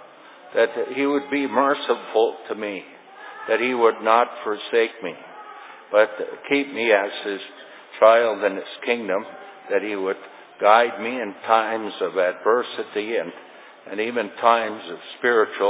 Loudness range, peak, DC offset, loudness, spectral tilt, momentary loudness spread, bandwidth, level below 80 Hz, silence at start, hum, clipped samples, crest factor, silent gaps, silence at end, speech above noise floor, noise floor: 3 LU; -2 dBFS; under 0.1%; -21 LUFS; -7.5 dB/octave; 18 LU; 4 kHz; -84 dBFS; 0 s; none; under 0.1%; 20 dB; none; 0 s; 24 dB; -45 dBFS